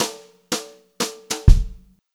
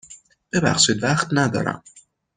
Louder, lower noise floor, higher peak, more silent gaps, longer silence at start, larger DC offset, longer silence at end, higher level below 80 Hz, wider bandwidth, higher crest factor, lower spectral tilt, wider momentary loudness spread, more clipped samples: second, -23 LUFS vs -20 LUFS; second, -38 dBFS vs -48 dBFS; about the same, 0 dBFS vs -2 dBFS; neither; about the same, 0 s vs 0.1 s; neither; second, 0.4 s vs 0.6 s; first, -22 dBFS vs -54 dBFS; first, 16 kHz vs 9.6 kHz; about the same, 20 dB vs 20 dB; about the same, -4.5 dB/octave vs -3.5 dB/octave; first, 20 LU vs 10 LU; neither